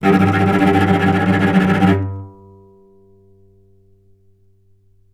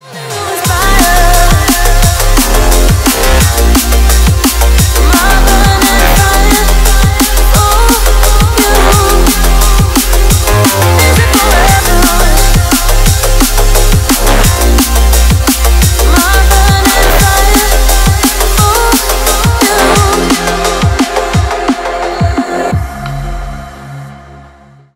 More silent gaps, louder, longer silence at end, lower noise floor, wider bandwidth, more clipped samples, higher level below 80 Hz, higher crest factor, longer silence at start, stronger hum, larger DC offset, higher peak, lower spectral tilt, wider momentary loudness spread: neither; second, -14 LUFS vs -8 LUFS; first, 2.85 s vs 0.55 s; first, -55 dBFS vs -38 dBFS; second, 12.5 kHz vs 16.5 kHz; second, under 0.1% vs 1%; second, -50 dBFS vs -10 dBFS; first, 18 dB vs 6 dB; about the same, 0 s vs 0.05 s; neither; neither; about the same, 0 dBFS vs 0 dBFS; first, -7.5 dB/octave vs -4 dB/octave; about the same, 6 LU vs 6 LU